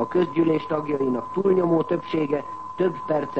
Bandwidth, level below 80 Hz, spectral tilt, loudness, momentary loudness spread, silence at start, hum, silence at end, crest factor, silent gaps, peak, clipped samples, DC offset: 8 kHz; -62 dBFS; -9 dB/octave; -23 LUFS; 5 LU; 0 s; none; 0 s; 14 dB; none; -8 dBFS; under 0.1%; 0.4%